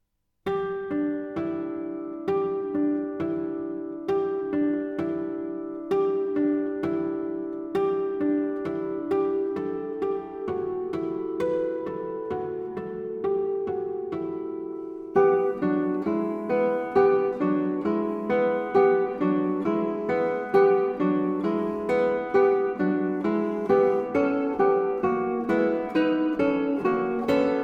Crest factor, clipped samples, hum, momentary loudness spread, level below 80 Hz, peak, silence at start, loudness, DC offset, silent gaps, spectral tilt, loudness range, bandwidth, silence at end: 18 dB; under 0.1%; none; 10 LU; -62 dBFS; -8 dBFS; 0.45 s; -26 LUFS; under 0.1%; none; -8.5 dB/octave; 6 LU; 5.6 kHz; 0 s